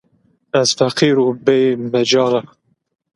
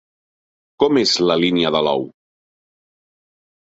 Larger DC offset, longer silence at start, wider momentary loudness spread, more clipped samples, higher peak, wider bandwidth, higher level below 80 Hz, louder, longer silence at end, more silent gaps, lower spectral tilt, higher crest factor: neither; second, 0.55 s vs 0.8 s; second, 4 LU vs 7 LU; neither; about the same, 0 dBFS vs -2 dBFS; first, 11.5 kHz vs 8 kHz; about the same, -62 dBFS vs -58 dBFS; about the same, -15 LUFS vs -17 LUFS; second, 0.7 s vs 1.6 s; neither; about the same, -4.5 dB/octave vs -4.5 dB/octave; about the same, 16 dB vs 18 dB